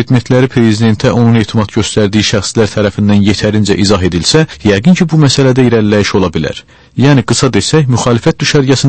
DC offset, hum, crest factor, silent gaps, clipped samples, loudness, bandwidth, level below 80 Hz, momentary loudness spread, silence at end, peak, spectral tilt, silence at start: under 0.1%; none; 8 dB; none; 0.5%; -9 LUFS; 8.8 kHz; -34 dBFS; 4 LU; 0 s; 0 dBFS; -5.5 dB/octave; 0 s